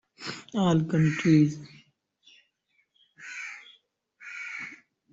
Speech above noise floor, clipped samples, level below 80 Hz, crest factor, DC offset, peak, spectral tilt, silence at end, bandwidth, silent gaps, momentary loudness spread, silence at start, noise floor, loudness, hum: 50 dB; under 0.1%; -64 dBFS; 20 dB; under 0.1%; -10 dBFS; -7 dB/octave; 0.4 s; 7.8 kHz; none; 21 LU; 0.2 s; -73 dBFS; -27 LUFS; none